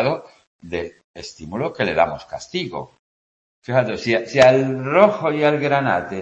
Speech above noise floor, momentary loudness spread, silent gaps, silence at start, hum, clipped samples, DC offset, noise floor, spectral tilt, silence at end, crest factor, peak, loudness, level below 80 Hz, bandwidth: over 71 dB; 19 LU; 0.47-0.59 s, 1.04-1.14 s, 2.99-3.62 s; 0 s; none; under 0.1%; under 0.1%; under -90 dBFS; -6 dB/octave; 0 s; 20 dB; 0 dBFS; -19 LUFS; -54 dBFS; 8.4 kHz